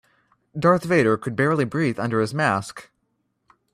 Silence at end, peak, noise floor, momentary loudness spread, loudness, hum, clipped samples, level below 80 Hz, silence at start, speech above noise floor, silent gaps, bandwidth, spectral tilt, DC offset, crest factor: 0.9 s; -6 dBFS; -72 dBFS; 13 LU; -21 LUFS; none; under 0.1%; -60 dBFS; 0.55 s; 51 dB; none; 14.5 kHz; -6.5 dB/octave; under 0.1%; 18 dB